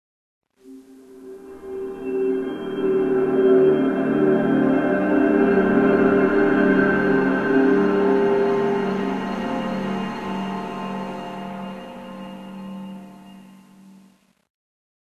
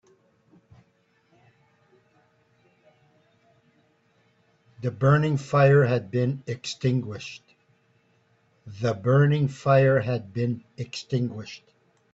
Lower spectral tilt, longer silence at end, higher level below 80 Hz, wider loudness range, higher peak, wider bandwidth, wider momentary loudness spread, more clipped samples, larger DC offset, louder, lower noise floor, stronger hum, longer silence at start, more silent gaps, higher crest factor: about the same, -8 dB/octave vs -7.5 dB/octave; first, 1.25 s vs 0.55 s; first, -54 dBFS vs -62 dBFS; first, 17 LU vs 6 LU; about the same, -6 dBFS vs -6 dBFS; second, 7 kHz vs 7.8 kHz; about the same, 19 LU vs 18 LU; neither; first, 0.1% vs under 0.1%; first, -20 LUFS vs -24 LUFS; second, -56 dBFS vs -66 dBFS; neither; second, 0.65 s vs 4.8 s; neither; about the same, 16 dB vs 20 dB